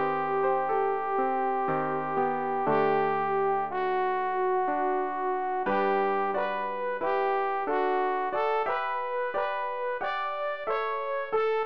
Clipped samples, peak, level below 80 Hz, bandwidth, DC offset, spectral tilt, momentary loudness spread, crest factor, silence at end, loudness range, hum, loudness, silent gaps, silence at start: under 0.1%; -12 dBFS; -68 dBFS; 5.6 kHz; 0.5%; -7.5 dB/octave; 4 LU; 14 dB; 0 s; 2 LU; none; -28 LUFS; none; 0 s